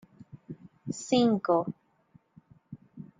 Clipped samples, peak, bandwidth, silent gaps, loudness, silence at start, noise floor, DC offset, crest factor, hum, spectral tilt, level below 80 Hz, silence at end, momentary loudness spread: under 0.1%; -12 dBFS; 9.4 kHz; none; -28 LUFS; 0.35 s; -63 dBFS; under 0.1%; 20 dB; none; -5.5 dB/octave; -70 dBFS; 0.15 s; 25 LU